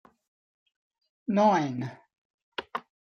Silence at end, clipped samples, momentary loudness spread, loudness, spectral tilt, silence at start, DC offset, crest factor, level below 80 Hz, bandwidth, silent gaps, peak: 0.4 s; under 0.1%; 17 LU; -27 LUFS; -6.5 dB/octave; 1.3 s; under 0.1%; 20 dB; -76 dBFS; 6.8 kHz; 2.18-2.52 s; -10 dBFS